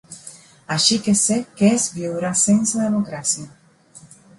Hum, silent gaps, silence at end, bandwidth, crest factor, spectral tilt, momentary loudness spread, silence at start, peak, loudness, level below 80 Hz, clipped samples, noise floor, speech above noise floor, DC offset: none; none; 0.4 s; 11.5 kHz; 18 dB; -3.5 dB/octave; 10 LU; 0.1 s; -2 dBFS; -18 LUFS; -58 dBFS; under 0.1%; -48 dBFS; 29 dB; under 0.1%